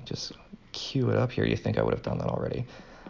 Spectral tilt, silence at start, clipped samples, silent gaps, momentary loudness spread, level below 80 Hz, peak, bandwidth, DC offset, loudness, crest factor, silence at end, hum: -6.5 dB/octave; 0 s; under 0.1%; none; 13 LU; -48 dBFS; -10 dBFS; 7.4 kHz; under 0.1%; -29 LUFS; 18 dB; 0 s; none